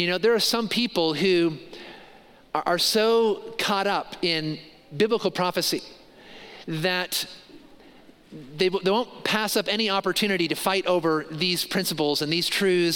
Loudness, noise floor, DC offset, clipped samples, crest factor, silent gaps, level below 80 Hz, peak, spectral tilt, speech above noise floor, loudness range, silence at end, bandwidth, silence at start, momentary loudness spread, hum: -24 LUFS; -51 dBFS; under 0.1%; under 0.1%; 20 dB; none; -62 dBFS; -6 dBFS; -3.5 dB/octave; 27 dB; 5 LU; 0 s; 17 kHz; 0 s; 14 LU; none